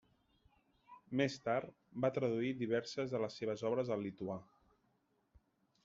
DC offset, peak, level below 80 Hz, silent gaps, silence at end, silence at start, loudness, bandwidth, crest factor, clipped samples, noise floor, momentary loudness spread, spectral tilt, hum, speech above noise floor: under 0.1%; -22 dBFS; -76 dBFS; none; 1.4 s; 0.9 s; -39 LUFS; 7.6 kHz; 20 dB; under 0.1%; -79 dBFS; 8 LU; -5.5 dB/octave; none; 40 dB